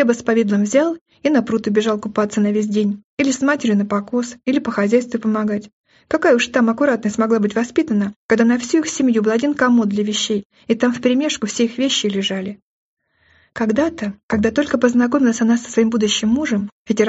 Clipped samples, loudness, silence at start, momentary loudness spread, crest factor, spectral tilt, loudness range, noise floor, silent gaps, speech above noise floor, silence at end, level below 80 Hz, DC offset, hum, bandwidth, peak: under 0.1%; -18 LUFS; 0 s; 7 LU; 16 dB; -4 dB/octave; 3 LU; -57 dBFS; 1.01-1.06 s, 3.04-3.18 s, 5.73-5.84 s, 8.16-8.29 s, 10.45-10.50 s, 12.62-12.97 s, 14.23-14.29 s, 16.72-16.85 s; 39 dB; 0 s; -54 dBFS; under 0.1%; none; 8 kHz; -2 dBFS